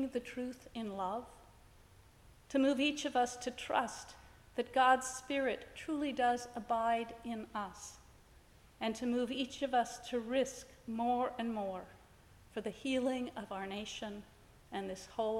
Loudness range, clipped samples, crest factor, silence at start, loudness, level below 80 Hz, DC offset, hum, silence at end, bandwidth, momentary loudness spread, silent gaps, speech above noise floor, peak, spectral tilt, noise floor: 5 LU; under 0.1%; 22 dB; 0 s; -37 LUFS; -66 dBFS; under 0.1%; none; 0 s; 16 kHz; 13 LU; none; 25 dB; -16 dBFS; -3.5 dB/octave; -62 dBFS